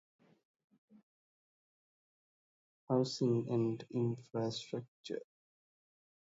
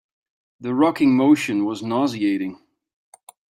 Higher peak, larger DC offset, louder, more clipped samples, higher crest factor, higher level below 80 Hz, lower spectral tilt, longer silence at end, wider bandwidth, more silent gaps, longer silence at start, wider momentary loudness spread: second, -20 dBFS vs -4 dBFS; neither; second, -37 LUFS vs -20 LUFS; neither; about the same, 20 dB vs 16 dB; second, -82 dBFS vs -68 dBFS; about the same, -7 dB/octave vs -6 dB/octave; about the same, 1 s vs 0.95 s; second, 7.6 kHz vs 14 kHz; first, 4.88-5.04 s vs none; first, 2.9 s vs 0.6 s; about the same, 12 LU vs 10 LU